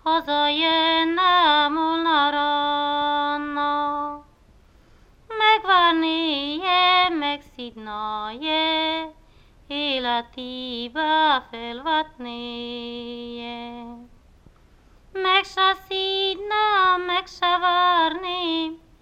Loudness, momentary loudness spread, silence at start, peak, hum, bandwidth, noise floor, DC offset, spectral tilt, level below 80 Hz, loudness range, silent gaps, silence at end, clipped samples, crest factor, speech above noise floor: -21 LUFS; 16 LU; 0.05 s; -4 dBFS; none; 14 kHz; -54 dBFS; under 0.1%; -3.5 dB/octave; -54 dBFS; 6 LU; none; 0.25 s; under 0.1%; 18 dB; 30 dB